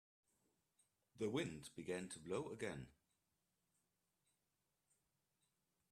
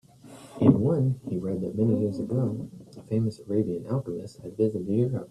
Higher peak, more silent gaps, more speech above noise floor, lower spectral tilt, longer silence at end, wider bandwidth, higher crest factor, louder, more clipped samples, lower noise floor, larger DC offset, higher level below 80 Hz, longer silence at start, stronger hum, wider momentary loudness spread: second, -30 dBFS vs -4 dBFS; neither; first, 42 dB vs 22 dB; second, -5 dB/octave vs -10 dB/octave; first, 3 s vs 0.05 s; first, 13 kHz vs 11.5 kHz; about the same, 22 dB vs 22 dB; second, -48 LUFS vs -27 LUFS; neither; first, -89 dBFS vs -48 dBFS; neither; second, -80 dBFS vs -58 dBFS; first, 1.15 s vs 0.25 s; neither; second, 9 LU vs 15 LU